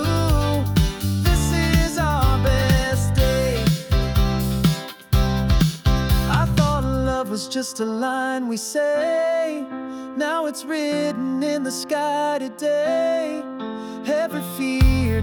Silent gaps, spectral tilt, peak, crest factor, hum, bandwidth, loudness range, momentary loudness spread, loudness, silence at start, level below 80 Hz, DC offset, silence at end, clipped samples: none; -5.5 dB/octave; -6 dBFS; 14 dB; none; over 20 kHz; 4 LU; 7 LU; -21 LUFS; 0 s; -26 dBFS; under 0.1%; 0 s; under 0.1%